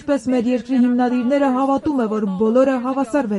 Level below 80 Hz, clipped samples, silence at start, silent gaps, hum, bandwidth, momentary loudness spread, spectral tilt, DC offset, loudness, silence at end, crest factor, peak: -54 dBFS; under 0.1%; 0 s; none; none; 11.5 kHz; 4 LU; -7 dB/octave; under 0.1%; -18 LUFS; 0 s; 14 dB; -4 dBFS